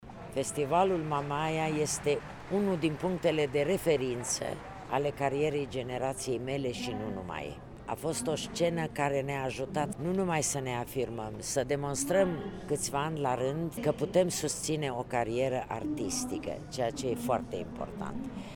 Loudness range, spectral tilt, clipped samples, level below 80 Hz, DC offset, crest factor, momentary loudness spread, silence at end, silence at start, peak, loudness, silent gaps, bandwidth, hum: 3 LU; -4.5 dB/octave; under 0.1%; -54 dBFS; under 0.1%; 20 dB; 9 LU; 0 s; 0 s; -12 dBFS; -32 LUFS; none; 19.5 kHz; none